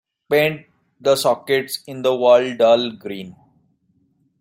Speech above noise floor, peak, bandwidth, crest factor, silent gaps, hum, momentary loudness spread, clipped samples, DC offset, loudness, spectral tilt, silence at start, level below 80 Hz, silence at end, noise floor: 45 dB; -2 dBFS; 16 kHz; 18 dB; none; none; 17 LU; under 0.1%; under 0.1%; -18 LUFS; -4 dB/octave; 0.3 s; -66 dBFS; 1.1 s; -63 dBFS